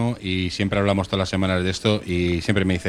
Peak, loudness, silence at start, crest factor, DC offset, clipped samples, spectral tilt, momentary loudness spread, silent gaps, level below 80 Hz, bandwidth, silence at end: -6 dBFS; -22 LUFS; 0 s; 16 dB; under 0.1%; under 0.1%; -6 dB/octave; 3 LU; none; -42 dBFS; 12 kHz; 0 s